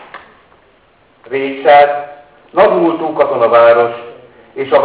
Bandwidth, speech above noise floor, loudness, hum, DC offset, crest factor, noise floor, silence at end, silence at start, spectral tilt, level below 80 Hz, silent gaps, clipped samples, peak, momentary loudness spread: 4 kHz; 40 dB; -11 LUFS; none; under 0.1%; 12 dB; -50 dBFS; 0 s; 0.15 s; -8.5 dB/octave; -58 dBFS; none; under 0.1%; 0 dBFS; 16 LU